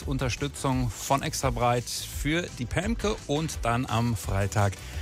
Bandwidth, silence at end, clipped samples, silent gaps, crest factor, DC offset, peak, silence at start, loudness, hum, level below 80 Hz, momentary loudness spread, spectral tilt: 16 kHz; 0 s; under 0.1%; none; 18 dB; under 0.1%; -10 dBFS; 0 s; -28 LUFS; none; -38 dBFS; 4 LU; -5 dB/octave